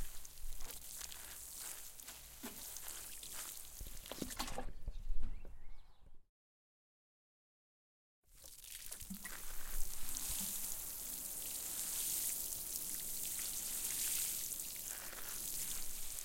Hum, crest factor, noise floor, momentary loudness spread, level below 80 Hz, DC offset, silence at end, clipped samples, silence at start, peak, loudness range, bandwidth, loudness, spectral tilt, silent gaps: none; 26 dB; under -90 dBFS; 14 LU; -50 dBFS; under 0.1%; 0 s; under 0.1%; 0 s; -16 dBFS; 16 LU; 17 kHz; -42 LUFS; -1 dB/octave; 6.29-8.22 s